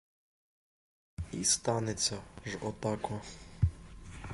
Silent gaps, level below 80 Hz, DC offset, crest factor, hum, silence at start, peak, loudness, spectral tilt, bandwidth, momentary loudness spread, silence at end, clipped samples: none; -46 dBFS; under 0.1%; 24 dB; none; 1.2 s; -14 dBFS; -34 LUFS; -3.5 dB/octave; 11.5 kHz; 20 LU; 0 s; under 0.1%